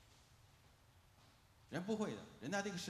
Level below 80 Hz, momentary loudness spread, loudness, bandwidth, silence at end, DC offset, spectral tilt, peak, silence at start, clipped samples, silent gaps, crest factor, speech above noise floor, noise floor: -76 dBFS; 25 LU; -44 LUFS; 14 kHz; 0 s; under 0.1%; -4.5 dB/octave; -26 dBFS; 0 s; under 0.1%; none; 20 dB; 25 dB; -69 dBFS